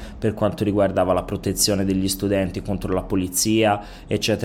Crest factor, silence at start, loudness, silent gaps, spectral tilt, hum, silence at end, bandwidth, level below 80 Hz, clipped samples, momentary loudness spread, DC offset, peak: 16 dB; 0 s; -21 LUFS; none; -4.5 dB/octave; none; 0 s; 17 kHz; -40 dBFS; under 0.1%; 7 LU; under 0.1%; -6 dBFS